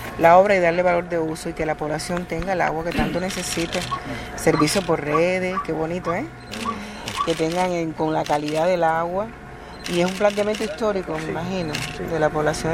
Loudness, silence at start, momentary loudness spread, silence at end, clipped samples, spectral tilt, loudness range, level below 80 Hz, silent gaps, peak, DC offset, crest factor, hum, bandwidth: -22 LUFS; 0 s; 10 LU; 0 s; under 0.1%; -5 dB/octave; 2 LU; -42 dBFS; none; -2 dBFS; under 0.1%; 20 dB; none; 16 kHz